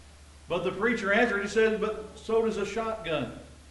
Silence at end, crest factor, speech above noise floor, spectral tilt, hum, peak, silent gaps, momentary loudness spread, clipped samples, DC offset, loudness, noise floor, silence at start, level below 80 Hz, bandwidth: 0 s; 16 dB; 23 dB; -5 dB/octave; none; -12 dBFS; none; 10 LU; under 0.1%; under 0.1%; -28 LUFS; -51 dBFS; 0 s; -54 dBFS; 11.5 kHz